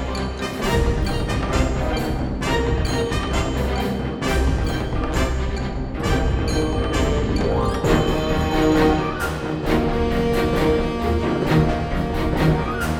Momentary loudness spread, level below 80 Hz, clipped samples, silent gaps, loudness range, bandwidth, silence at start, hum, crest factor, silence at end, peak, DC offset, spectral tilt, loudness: 6 LU; -26 dBFS; under 0.1%; none; 3 LU; 17.5 kHz; 0 s; none; 16 dB; 0 s; -4 dBFS; under 0.1%; -6 dB/octave; -21 LUFS